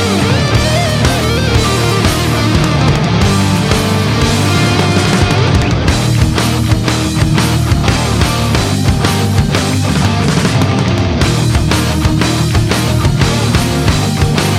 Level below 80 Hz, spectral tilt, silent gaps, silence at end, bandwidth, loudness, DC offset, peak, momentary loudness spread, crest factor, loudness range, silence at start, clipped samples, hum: -22 dBFS; -5 dB/octave; none; 0 s; 16 kHz; -12 LUFS; under 0.1%; 0 dBFS; 2 LU; 12 dB; 1 LU; 0 s; under 0.1%; none